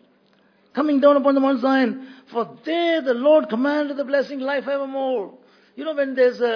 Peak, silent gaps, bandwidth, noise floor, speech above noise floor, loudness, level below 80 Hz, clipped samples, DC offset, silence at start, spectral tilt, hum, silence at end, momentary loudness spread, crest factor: -4 dBFS; none; 5.4 kHz; -59 dBFS; 39 dB; -20 LUFS; -82 dBFS; under 0.1%; under 0.1%; 0.75 s; -6 dB/octave; none; 0 s; 12 LU; 18 dB